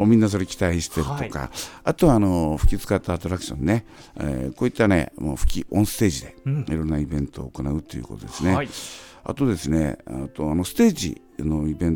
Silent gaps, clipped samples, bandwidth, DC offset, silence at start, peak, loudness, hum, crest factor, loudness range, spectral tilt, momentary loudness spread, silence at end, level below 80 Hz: none; under 0.1%; 18.5 kHz; under 0.1%; 0 s; -4 dBFS; -24 LUFS; none; 20 dB; 4 LU; -6 dB/octave; 12 LU; 0 s; -32 dBFS